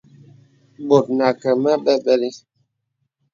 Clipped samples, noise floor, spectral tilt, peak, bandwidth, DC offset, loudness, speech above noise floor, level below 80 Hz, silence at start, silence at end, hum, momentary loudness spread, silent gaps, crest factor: under 0.1%; -74 dBFS; -6 dB/octave; 0 dBFS; 7.6 kHz; under 0.1%; -18 LUFS; 56 dB; -70 dBFS; 0.8 s; 0.95 s; none; 6 LU; none; 20 dB